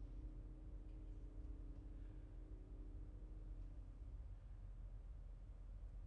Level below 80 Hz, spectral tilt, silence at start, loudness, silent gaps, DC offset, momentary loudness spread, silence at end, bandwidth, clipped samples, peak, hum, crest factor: -54 dBFS; -9.5 dB/octave; 0 s; -58 LUFS; none; under 0.1%; 2 LU; 0 s; 3.6 kHz; under 0.1%; -42 dBFS; none; 10 dB